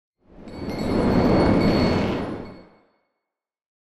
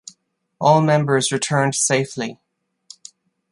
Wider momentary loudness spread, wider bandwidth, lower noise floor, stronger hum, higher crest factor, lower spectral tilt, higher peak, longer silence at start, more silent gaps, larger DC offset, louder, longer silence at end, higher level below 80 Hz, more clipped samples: first, 18 LU vs 11 LU; about the same, 12.5 kHz vs 11.5 kHz; first, -85 dBFS vs -60 dBFS; neither; about the same, 16 dB vs 18 dB; first, -7.5 dB/octave vs -4 dB/octave; second, -8 dBFS vs -2 dBFS; second, 0.4 s vs 0.6 s; neither; neither; second, -21 LUFS vs -18 LUFS; first, 1.4 s vs 1.15 s; first, -38 dBFS vs -66 dBFS; neither